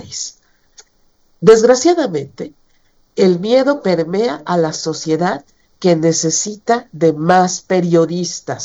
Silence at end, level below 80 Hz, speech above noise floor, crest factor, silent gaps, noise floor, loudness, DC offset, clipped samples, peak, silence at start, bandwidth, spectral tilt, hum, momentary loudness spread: 0 s; -56 dBFS; 41 dB; 16 dB; none; -55 dBFS; -15 LUFS; under 0.1%; under 0.1%; 0 dBFS; 0 s; 8.2 kHz; -4.5 dB/octave; none; 14 LU